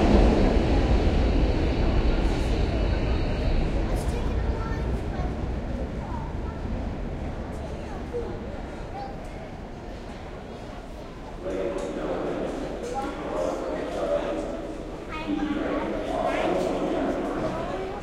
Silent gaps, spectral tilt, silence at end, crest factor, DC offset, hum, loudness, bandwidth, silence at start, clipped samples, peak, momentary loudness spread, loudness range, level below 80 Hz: none; -7 dB/octave; 0 s; 20 dB; under 0.1%; none; -28 LUFS; 11.5 kHz; 0 s; under 0.1%; -6 dBFS; 15 LU; 10 LU; -30 dBFS